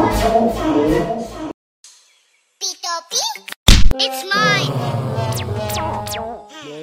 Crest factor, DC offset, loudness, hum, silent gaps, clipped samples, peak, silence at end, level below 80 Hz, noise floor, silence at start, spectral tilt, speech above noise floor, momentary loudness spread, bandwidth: 16 dB; under 0.1%; -18 LUFS; none; 1.54-1.83 s, 3.56-3.66 s; under 0.1%; 0 dBFS; 0 s; -24 dBFS; -59 dBFS; 0 s; -4 dB/octave; 42 dB; 15 LU; 16 kHz